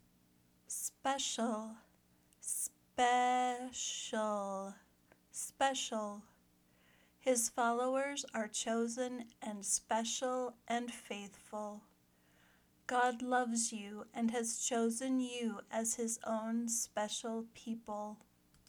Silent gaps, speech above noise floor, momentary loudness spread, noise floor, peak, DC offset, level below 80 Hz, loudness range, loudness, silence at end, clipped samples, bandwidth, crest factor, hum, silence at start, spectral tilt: none; 33 dB; 12 LU; -71 dBFS; -18 dBFS; under 0.1%; -78 dBFS; 4 LU; -38 LUFS; 0.55 s; under 0.1%; over 20 kHz; 22 dB; none; 0.7 s; -2 dB/octave